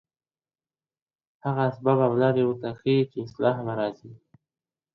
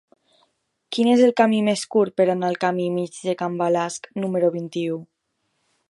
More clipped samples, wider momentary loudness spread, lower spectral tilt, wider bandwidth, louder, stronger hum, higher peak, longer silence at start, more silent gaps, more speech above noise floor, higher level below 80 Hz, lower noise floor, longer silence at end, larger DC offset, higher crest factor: neither; about the same, 9 LU vs 11 LU; first, -9.5 dB/octave vs -5.5 dB/octave; second, 6 kHz vs 11.5 kHz; second, -25 LUFS vs -21 LUFS; neither; second, -8 dBFS vs -2 dBFS; first, 1.45 s vs 0.9 s; neither; first, over 66 dB vs 53 dB; first, -66 dBFS vs -72 dBFS; first, under -90 dBFS vs -73 dBFS; about the same, 0.8 s vs 0.85 s; neither; about the same, 18 dB vs 20 dB